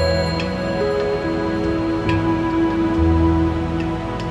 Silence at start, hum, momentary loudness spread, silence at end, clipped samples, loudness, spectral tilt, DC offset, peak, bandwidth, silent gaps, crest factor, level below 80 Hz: 0 s; none; 6 LU; 0 s; under 0.1%; -20 LUFS; -7.5 dB/octave; under 0.1%; -4 dBFS; 12 kHz; none; 14 dB; -30 dBFS